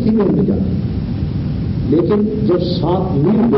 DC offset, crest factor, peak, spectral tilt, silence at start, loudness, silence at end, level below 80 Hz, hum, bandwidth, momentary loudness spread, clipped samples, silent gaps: under 0.1%; 12 dB; -4 dBFS; -13.5 dB/octave; 0 s; -16 LUFS; 0 s; -30 dBFS; none; 5.8 kHz; 6 LU; under 0.1%; none